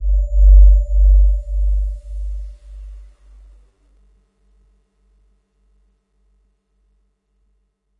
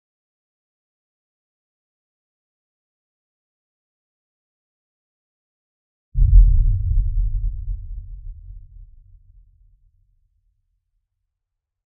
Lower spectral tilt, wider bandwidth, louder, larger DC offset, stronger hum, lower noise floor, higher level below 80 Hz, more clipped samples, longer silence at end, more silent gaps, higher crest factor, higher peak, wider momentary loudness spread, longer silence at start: second, -10 dB/octave vs -27 dB/octave; first, 0.6 kHz vs 0.2 kHz; first, -16 LUFS vs -21 LUFS; neither; first, 50 Hz at -40 dBFS vs none; second, -65 dBFS vs -81 dBFS; first, -16 dBFS vs -24 dBFS; neither; first, 5 s vs 3.05 s; neither; second, 16 dB vs 22 dB; about the same, 0 dBFS vs -2 dBFS; about the same, 27 LU vs 25 LU; second, 0 s vs 6.15 s